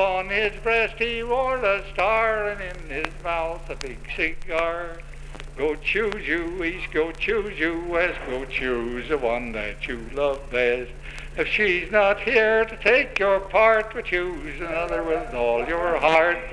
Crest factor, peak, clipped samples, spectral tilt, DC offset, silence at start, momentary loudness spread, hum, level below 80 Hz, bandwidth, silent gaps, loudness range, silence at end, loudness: 20 dB; -2 dBFS; under 0.1%; -5 dB/octave; under 0.1%; 0 s; 13 LU; none; -38 dBFS; 10.5 kHz; none; 7 LU; 0 s; -23 LUFS